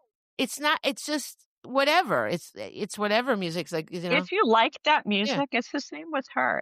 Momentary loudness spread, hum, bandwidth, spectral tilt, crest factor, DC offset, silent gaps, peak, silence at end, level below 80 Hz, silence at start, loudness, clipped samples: 12 LU; none; 15.5 kHz; -3.5 dB/octave; 16 dB; under 0.1%; 1.45-1.62 s; -10 dBFS; 0 s; -76 dBFS; 0.4 s; -26 LUFS; under 0.1%